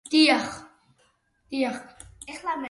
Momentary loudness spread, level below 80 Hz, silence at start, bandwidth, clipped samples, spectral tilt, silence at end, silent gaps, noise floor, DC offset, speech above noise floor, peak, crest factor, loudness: 24 LU; -62 dBFS; 0.05 s; 11.5 kHz; under 0.1%; -2.5 dB/octave; 0 s; none; -67 dBFS; under 0.1%; 43 dB; -8 dBFS; 20 dB; -24 LUFS